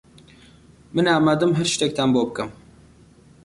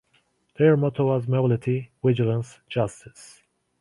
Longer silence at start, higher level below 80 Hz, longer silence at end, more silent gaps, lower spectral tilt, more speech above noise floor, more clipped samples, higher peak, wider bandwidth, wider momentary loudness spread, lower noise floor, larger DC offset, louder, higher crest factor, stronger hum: first, 0.95 s vs 0.6 s; about the same, -56 dBFS vs -58 dBFS; first, 0.9 s vs 0.55 s; neither; second, -5 dB/octave vs -8 dB/octave; second, 31 dB vs 44 dB; neither; about the same, -8 dBFS vs -6 dBFS; about the same, 11.5 kHz vs 11.5 kHz; about the same, 11 LU vs 10 LU; second, -51 dBFS vs -66 dBFS; neither; first, -20 LUFS vs -23 LUFS; about the same, 16 dB vs 18 dB; neither